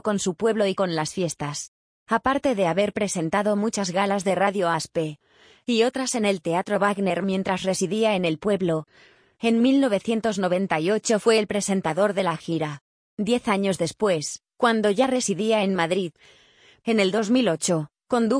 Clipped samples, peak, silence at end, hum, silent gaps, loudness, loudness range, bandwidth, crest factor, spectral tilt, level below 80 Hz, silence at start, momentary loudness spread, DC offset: under 0.1%; -6 dBFS; 0 s; none; 1.68-2.06 s, 12.81-13.17 s; -23 LUFS; 2 LU; 10.5 kHz; 16 dB; -4.5 dB/octave; -62 dBFS; 0.05 s; 7 LU; under 0.1%